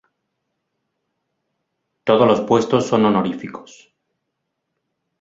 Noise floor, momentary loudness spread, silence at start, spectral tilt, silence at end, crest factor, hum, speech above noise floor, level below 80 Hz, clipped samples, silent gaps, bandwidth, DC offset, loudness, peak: -76 dBFS; 17 LU; 2.05 s; -6.5 dB/octave; 1.6 s; 20 dB; none; 60 dB; -60 dBFS; under 0.1%; none; 7.8 kHz; under 0.1%; -17 LUFS; -2 dBFS